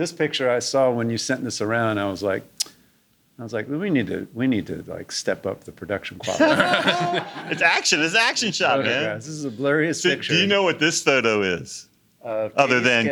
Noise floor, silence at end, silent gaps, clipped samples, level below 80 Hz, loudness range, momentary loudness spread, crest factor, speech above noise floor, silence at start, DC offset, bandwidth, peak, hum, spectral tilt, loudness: -62 dBFS; 0 s; none; under 0.1%; -66 dBFS; 7 LU; 12 LU; 20 dB; 40 dB; 0 s; under 0.1%; over 20 kHz; -2 dBFS; none; -3.5 dB/octave; -21 LUFS